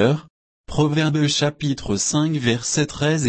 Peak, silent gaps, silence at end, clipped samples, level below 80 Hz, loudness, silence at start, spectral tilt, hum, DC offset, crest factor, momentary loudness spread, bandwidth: -6 dBFS; 0.30-0.64 s; 0 s; under 0.1%; -44 dBFS; -20 LUFS; 0 s; -4.5 dB/octave; none; under 0.1%; 16 dB; 5 LU; 8.8 kHz